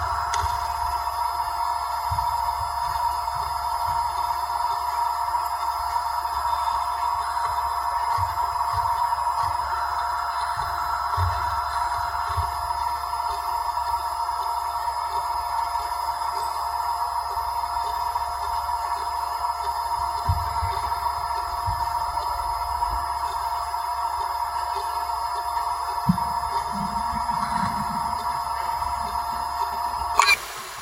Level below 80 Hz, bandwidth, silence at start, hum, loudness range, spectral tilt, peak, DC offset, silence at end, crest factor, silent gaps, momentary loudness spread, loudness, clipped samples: -42 dBFS; 16 kHz; 0 s; none; 2 LU; -3.5 dB/octave; 0 dBFS; under 0.1%; 0 s; 24 dB; none; 3 LU; -25 LUFS; under 0.1%